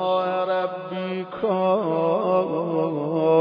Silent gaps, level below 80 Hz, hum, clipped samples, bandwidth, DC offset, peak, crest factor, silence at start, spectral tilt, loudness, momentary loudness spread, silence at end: none; -70 dBFS; none; under 0.1%; 5.2 kHz; under 0.1%; -8 dBFS; 14 dB; 0 s; -9.5 dB/octave; -23 LUFS; 8 LU; 0 s